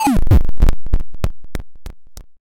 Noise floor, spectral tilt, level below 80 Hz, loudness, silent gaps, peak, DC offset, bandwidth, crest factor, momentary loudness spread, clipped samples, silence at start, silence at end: -33 dBFS; -7 dB/octave; -18 dBFS; -19 LUFS; none; -4 dBFS; under 0.1%; 15.5 kHz; 8 dB; 24 LU; under 0.1%; 0 s; 0 s